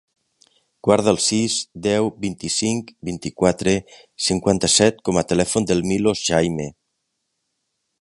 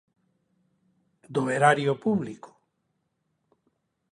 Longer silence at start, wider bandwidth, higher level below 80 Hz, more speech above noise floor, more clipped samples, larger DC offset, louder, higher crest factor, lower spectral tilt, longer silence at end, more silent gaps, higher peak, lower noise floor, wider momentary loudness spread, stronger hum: second, 0.85 s vs 1.3 s; about the same, 11.5 kHz vs 11.5 kHz; first, -46 dBFS vs -72 dBFS; about the same, 55 dB vs 52 dB; neither; neither; first, -20 LUFS vs -25 LUFS; about the same, 20 dB vs 24 dB; second, -4 dB/octave vs -6 dB/octave; second, 1.3 s vs 1.7 s; neither; first, 0 dBFS vs -6 dBFS; about the same, -75 dBFS vs -76 dBFS; second, 11 LU vs 16 LU; neither